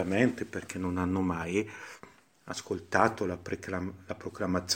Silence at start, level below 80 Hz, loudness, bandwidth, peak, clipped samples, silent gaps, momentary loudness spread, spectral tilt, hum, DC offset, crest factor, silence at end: 0 s; -60 dBFS; -32 LUFS; 16.5 kHz; -8 dBFS; under 0.1%; none; 14 LU; -5 dB/octave; none; under 0.1%; 24 dB; 0 s